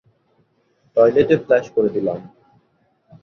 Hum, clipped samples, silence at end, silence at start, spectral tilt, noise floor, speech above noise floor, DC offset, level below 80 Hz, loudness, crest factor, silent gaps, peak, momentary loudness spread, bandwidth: none; under 0.1%; 0.95 s; 0.95 s; -7.5 dB/octave; -63 dBFS; 46 dB; under 0.1%; -58 dBFS; -17 LUFS; 18 dB; none; -2 dBFS; 10 LU; 6.8 kHz